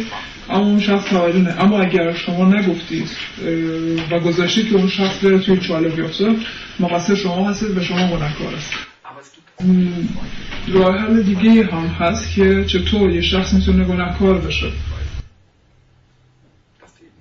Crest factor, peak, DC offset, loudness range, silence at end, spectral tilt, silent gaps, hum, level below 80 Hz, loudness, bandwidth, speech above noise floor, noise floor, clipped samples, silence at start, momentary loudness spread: 12 dB; -4 dBFS; under 0.1%; 5 LU; 1.95 s; -6 dB/octave; none; none; -34 dBFS; -17 LUFS; 6.8 kHz; 38 dB; -54 dBFS; under 0.1%; 0 s; 11 LU